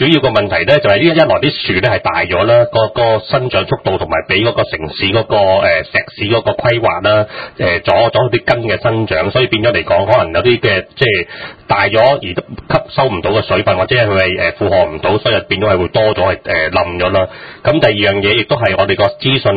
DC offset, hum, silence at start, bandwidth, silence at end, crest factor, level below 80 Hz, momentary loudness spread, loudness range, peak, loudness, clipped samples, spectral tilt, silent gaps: under 0.1%; none; 0 s; 5 kHz; 0 s; 12 dB; -36 dBFS; 6 LU; 1 LU; 0 dBFS; -12 LUFS; under 0.1%; -8 dB/octave; none